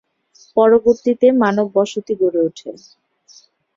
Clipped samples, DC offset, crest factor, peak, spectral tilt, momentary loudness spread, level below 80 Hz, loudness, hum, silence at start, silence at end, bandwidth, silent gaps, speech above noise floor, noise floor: under 0.1%; under 0.1%; 16 dB; -2 dBFS; -6 dB/octave; 10 LU; -58 dBFS; -16 LUFS; none; 0.55 s; 1 s; 7.6 kHz; none; 37 dB; -52 dBFS